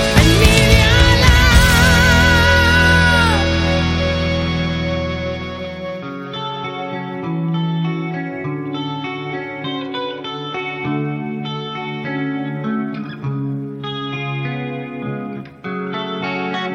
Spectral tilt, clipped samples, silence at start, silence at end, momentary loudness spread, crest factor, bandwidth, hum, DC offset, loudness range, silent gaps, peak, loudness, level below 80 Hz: -5 dB/octave; under 0.1%; 0 s; 0 s; 15 LU; 16 dB; 16.5 kHz; none; under 0.1%; 13 LU; none; 0 dBFS; -17 LUFS; -24 dBFS